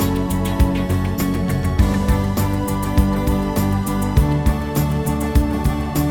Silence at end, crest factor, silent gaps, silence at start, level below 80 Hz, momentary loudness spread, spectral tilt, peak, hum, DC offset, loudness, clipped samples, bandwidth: 0 s; 16 dB; none; 0 s; -24 dBFS; 3 LU; -6.5 dB/octave; -2 dBFS; none; 0.5%; -19 LUFS; under 0.1%; 18 kHz